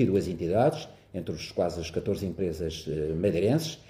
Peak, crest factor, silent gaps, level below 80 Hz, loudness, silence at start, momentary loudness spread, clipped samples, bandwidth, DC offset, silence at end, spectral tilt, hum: -12 dBFS; 16 dB; none; -50 dBFS; -29 LUFS; 0 s; 11 LU; under 0.1%; 16 kHz; under 0.1%; 0.1 s; -6.5 dB/octave; none